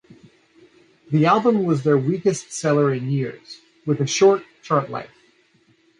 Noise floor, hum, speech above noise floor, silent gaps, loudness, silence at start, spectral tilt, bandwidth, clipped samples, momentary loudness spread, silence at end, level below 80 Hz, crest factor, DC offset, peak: -59 dBFS; none; 40 dB; none; -20 LUFS; 1.1 s; -6 dB/octave; 11 kHz; under 0.1%; 15 LU; 0.95 s; -66 dBFS; 18 dB; under 0.1%; -4 dBFS